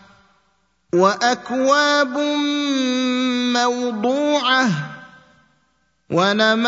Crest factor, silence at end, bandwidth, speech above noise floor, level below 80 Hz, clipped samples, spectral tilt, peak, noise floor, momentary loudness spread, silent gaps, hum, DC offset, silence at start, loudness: 18 dB; 0 s; 7.8 kHz; 47 dB; -68 dBFS; under 0.1%; -4 dB/octave; -2 dBFS; -65 dBFS; 6 LU; none; none; under 0.1%; 0.95 s; -18 LUFS